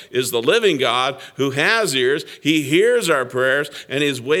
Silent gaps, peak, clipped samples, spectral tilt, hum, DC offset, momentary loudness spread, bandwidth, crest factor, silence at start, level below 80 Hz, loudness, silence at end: none; -2 dBFS; under 0.1%; -3.5 dB/octave; none; under 0.1%; 6 LU; 17.5 kHz; 18 dB; 0 s; -72 dBFS; -18 LUFS; 0 s